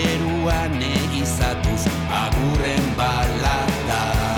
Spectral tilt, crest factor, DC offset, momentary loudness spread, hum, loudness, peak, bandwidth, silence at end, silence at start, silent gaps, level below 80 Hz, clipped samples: -5 dB/octave; 10 dB; under 0.1%; 1 LU; none; -21 LUFS; -10 dBFS; over 20 kHz; 0 s; 0 s; none; -28 dBFS; under 0.1%